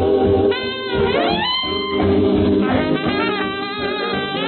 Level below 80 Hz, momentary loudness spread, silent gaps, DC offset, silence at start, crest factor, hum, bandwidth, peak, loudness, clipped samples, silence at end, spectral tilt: -40 dBFS; 6 LU; none; under 0.1%; 0 s; 12 dB; none; 4.5 kHz; -6 dBFS; -18 LUFS; under 0.1%; 0 s; -11 dB/octave